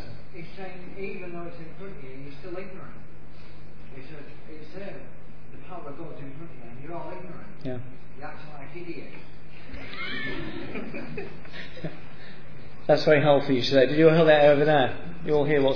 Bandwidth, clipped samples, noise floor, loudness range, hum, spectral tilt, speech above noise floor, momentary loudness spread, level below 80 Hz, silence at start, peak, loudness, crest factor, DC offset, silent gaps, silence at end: 5.4 kHz; under 0.1%; -47 dBFS; 22 LU; none; -7 dB/octave; 21 dB; 26 LU; -52 dBFS; 0 s; -6 dBFS; -23 LUFS; 22 dB; 4%; none; 0 s